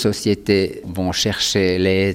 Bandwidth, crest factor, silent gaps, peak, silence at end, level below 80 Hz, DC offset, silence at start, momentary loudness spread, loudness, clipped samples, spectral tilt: 17 kHz; 16 dB; none; -2 dBFS; 0 s; -46 dBFS; under 0.1%; 0 s; 6 LU; -18 LUFS; under 0.1%; -4.5 dB/octave